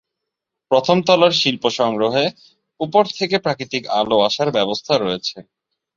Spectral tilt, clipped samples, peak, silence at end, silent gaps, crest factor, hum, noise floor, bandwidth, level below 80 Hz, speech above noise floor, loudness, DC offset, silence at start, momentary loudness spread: -4.5 dB/octave; under 0.1%; -2 dBFS; 0.55 s; none; 18 dB; none; -81 dBFS; 7.6 kHz; -60 dBFS; 64 dB; -18 LUFS; under 0.1%; 0.7 s; 9 LU